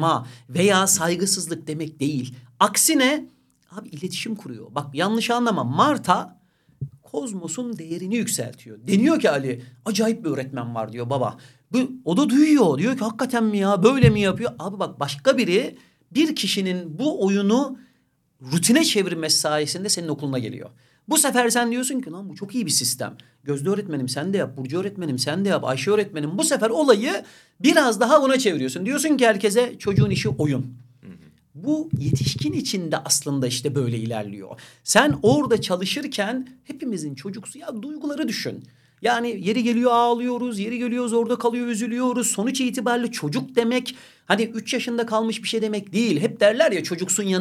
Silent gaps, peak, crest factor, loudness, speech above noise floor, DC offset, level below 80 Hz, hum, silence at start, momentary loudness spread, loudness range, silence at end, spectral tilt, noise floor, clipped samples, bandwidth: none; 0 dBFS; 22 dB; -22 LUFS; 43 dB; under 0.1%; -56 dBFS; none; 0 s; 13 LU; 5 LU; 0 s; -4 dB/octave; -65 dBFS; under 0.1%; 16 kHz